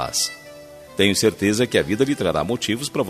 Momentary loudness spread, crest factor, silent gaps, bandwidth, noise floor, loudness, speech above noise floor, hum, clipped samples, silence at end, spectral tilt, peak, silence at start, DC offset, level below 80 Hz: 12 LU; 20 dB; none; 14.5 kHz; -41 dBFS; -20 LUFS; 21 dB; none; under 0.1%; 0 s; -3.5 dB/octave; -2 dBFS; 0 s; under 0.1%; -52 dBFS